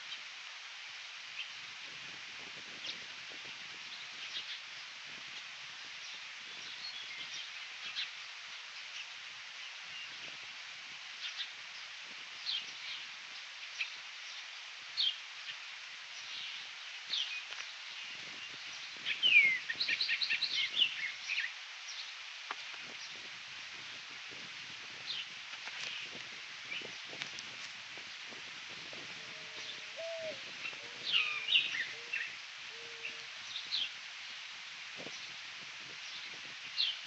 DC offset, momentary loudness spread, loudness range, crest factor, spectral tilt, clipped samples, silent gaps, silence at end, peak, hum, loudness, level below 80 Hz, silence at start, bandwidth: under 0.1%; 13 LU; 12 LU; 26 dB; 1 dB/octave; under 0.1%; none; 0 s; -14 dBFS; none; -38 LUFS; -90 dBFS; 0 s; 8.4 kHz